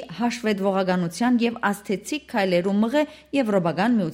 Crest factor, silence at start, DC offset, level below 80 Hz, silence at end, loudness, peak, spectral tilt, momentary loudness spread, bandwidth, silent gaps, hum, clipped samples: 14 dB; 0 s; under 0.1%; -62 dBFS; 0 s; -23 LUFS; -8 dBFS; -6 dB/octave; 6 LU; 16 kHz; none; none; under 0.1%